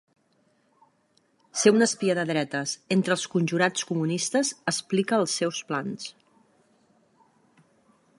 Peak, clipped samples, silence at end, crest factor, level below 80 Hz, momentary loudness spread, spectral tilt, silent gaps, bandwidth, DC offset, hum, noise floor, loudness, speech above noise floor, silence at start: -6 dBFS; under 0.1%; 2.1 s; 22 dB; -76 dBFS; 9 LU; -4 dB/octave; none; 11.5 kHz; under 0.1%; none; -67 dBFS; -25 LUFS; 42 dB; 1.55 s